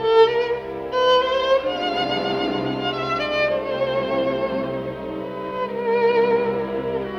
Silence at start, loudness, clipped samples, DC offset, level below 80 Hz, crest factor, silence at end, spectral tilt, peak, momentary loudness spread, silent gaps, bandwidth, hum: 0 s; -21 LUFS; under 0.1%; under 0.1%; -52 dBFS; 16 dB; 0 s; -5.5 dB/octave; -6 dBFS; 10 LU; none; 7 kHz; none